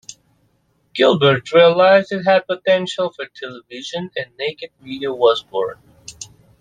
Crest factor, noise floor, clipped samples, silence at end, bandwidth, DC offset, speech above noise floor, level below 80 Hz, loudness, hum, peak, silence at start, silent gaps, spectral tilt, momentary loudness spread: 16 dB; -62 dBFS; under 0.1%; 0.35 s; 9.4 kHz; under 0.1%; 45 dB; -62 dBFS; -17 LUFS; none; -2 dBFS; 0.1 s; none; -5 dB/octave; 21 LU